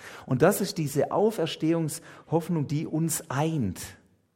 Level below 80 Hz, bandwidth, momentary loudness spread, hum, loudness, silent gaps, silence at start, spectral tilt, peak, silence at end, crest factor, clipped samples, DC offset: -64 dBFS; 16.5 kHz; 10 LU; none; -27 LUFS; none; 0 s; -5.5 dB/octave; -6 dBFS; 0.4 s; 22 dB; under 0.1%; under 0.1%